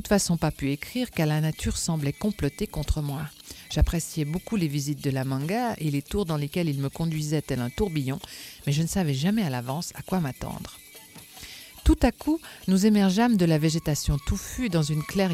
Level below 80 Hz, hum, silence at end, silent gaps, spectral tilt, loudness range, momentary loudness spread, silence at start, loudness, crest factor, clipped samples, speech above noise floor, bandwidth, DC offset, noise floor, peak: -36 dBFS; none; 0 s; none; -5.5 dB/octave; 5 LU; 13 LU; 0 s; -26 LUFS; 20 dB; under 0.1%; 22 dB; 16 kHz; under 0.1%; -47 dBFS; -6 dBFS